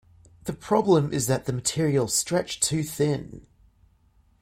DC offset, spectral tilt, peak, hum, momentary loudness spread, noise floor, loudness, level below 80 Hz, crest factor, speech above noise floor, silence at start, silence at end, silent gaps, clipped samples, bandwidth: under 0.1%; -4.5 dB/octave; -8 dBFS; none; 14 LU; -61 dBFS; -24 LUFS; -56 dBFS; 18 dB; 37 dB; 0.45 s; 1 s; none; under 0.1%; 16.5 kHz